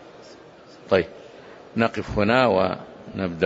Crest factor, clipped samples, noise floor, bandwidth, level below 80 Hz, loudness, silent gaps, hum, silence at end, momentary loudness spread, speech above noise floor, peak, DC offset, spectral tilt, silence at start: 20 dB; under 0.1%; -46 dBFS; 8 kHz; -48 dBFS; -23 LUFS; none; none; 0 s; 22 LU; 25 dB; -4 dBFS; under 0.1%; -7 dB/octave; 0 s